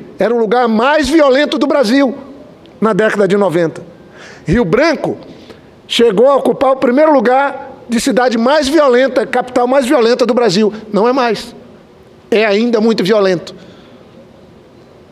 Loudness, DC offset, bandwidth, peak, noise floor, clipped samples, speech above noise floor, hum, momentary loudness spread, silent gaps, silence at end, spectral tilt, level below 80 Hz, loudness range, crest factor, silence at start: -12 LUFS; under 0.1%; 14 kHz; 0 dBFS; -41 dBFS; under 0.1%; 30 dB; none; 9 LU; none; 1.55 s; -5 dB/octave; -42 dBFS; 3 LU; 12 dB; 0 s